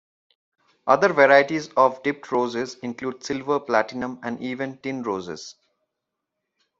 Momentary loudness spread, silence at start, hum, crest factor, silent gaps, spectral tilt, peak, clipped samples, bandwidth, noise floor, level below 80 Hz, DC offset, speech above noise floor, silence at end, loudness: 15 LU; 0.85 s; none; 22 dB; none; -5 dB/octave; -2 dBFS; under 0.1%; 7.8 kHz; -82 dBFS; -66 dBFS; under 0.1%; 60 dB; 1.3 s; -22 LUFS